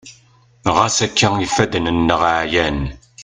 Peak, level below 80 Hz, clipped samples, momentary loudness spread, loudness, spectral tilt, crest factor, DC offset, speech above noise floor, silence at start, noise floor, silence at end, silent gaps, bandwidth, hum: 0 dBFS; -36 dBFS; under 0.1%; 7 LU; -16 LUFS; -4 dB/octave; 18 dB; under 0.1%; 35 dB; 0.05 s; -51 dBFS; 0 s; none; 10 kHz; none